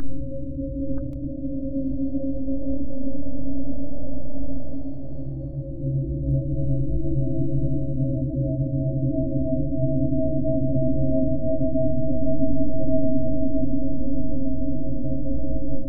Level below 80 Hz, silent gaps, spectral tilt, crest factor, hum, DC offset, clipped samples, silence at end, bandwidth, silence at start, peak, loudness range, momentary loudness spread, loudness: -34 dBFS; none; -15.5 dB/octave; 10 dB; none; under 0.1%; under 0.1%; 0 s; 1.3 kHz; 0 s; -8 dBFS; 6 LU; 9 LU; -27 LUFS